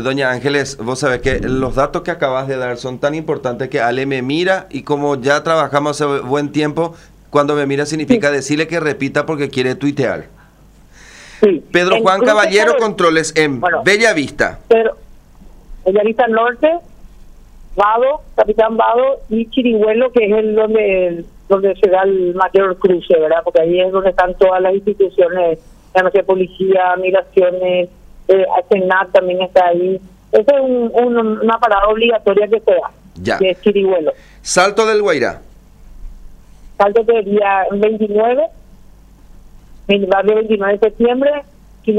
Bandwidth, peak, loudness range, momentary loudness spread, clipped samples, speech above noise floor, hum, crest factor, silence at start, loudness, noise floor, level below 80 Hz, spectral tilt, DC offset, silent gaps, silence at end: 11.5 kHz; 0 dBFS; 4 LU; 7 LU; under 0.1%; 31 dB; none; 14 dB; 0 s; -14 LUFS; -44 dBFS; -40 dBFS; -5 dB/octave; under 0.1%; none; 0 s